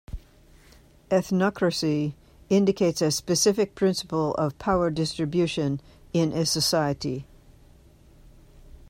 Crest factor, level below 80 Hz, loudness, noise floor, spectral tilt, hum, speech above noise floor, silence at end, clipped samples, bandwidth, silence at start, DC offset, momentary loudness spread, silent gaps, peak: 16 dB; -50 dBFS; -25 LUFS; -54 dBFS; -5 dB/octave; none; 30 dB; 0.3 s; under 0.1%; 16 kHz; 0.1 s; under 0.1%; 8 LU; none; -10 dBFS